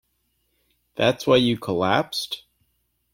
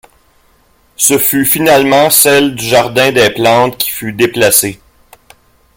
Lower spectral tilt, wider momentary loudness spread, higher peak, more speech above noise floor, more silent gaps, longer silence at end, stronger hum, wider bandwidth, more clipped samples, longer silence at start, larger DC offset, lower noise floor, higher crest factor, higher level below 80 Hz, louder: first, -5 dB/octave vs -3 dB/octave; first, 14 LU vs 8 LU; second, -4 dBFS vs 0 dBFS; first, 50 dB vs 41 dB; neither; second, 0.75 s vs 1 s; neither; second, 16.5 kHz vs over 20 kHz; second, under 0.1% vs 0.2%; about the same, 0.95 s vs 1 s; neither; first, -71 dBFS vs -50 dBFS; first, 20 dB vs 12 dB; second, -58 dBFS vs -46 dBFS; second, -22 LUFS vs -9 LUFS